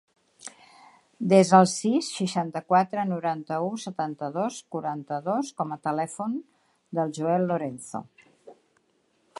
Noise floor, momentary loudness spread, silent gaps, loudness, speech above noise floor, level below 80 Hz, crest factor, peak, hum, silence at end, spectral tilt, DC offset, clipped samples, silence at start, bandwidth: -69 dBFS; 16 LU; none; -26 LUFS; 43 dB; -74 dBFS; 24 dB; -2 dBFS; none; 0.85 s; -5.5 dB/octave; under 0.1%; under 0.1%; 0.45 s; 11.5 kHz